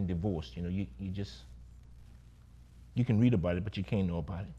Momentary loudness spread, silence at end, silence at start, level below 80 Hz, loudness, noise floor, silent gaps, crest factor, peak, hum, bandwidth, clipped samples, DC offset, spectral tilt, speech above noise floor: 16 LU; 0 s; 0 s; -50 dBFS; -33 LUFS; -55 dBFS; none; 18 dB; -16 dBFS; 60 Hz at -50 dBFS; 8 kHz; under 0.1%; under 0.1%; -8.5 dB/octave; 23 dB